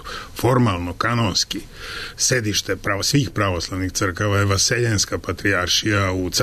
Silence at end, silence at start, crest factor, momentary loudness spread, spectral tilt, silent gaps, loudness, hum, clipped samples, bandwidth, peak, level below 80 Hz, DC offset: 0 s; 0 s; 14 dB; 7 LU; -3.5 dB/octave; none; -20 LUFS; none; under 0.1%; 13.5 kHz; -6 dBFS; -42 dBFS; under 0.1%